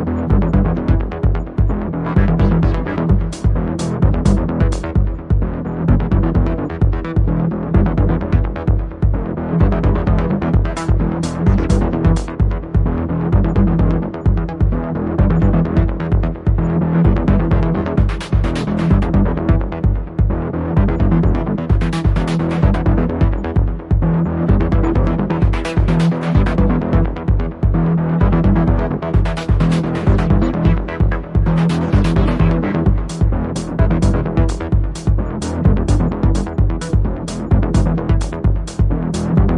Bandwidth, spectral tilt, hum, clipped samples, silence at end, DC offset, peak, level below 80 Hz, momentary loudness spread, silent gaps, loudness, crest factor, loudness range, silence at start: 10.5 kHz; -8 dB/octave; none; under 0.1%; 0 s; under 0.1%; 0 dBFS; -20 dBFS; 4 LU; none; -17 LUFS; 14 dB; 2 LU; 0 s